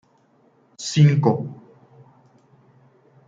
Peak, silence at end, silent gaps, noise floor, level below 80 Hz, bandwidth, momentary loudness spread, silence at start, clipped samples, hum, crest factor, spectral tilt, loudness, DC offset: -4 dBFS; 1.75 s; none; -59 dBFS; -62 dBFS; 7.8 kHz; 17 LU; 0.8 s; under 0.1%; none; 18 dB; -6.5 dB/octave; -19 LUFS; under 0.1%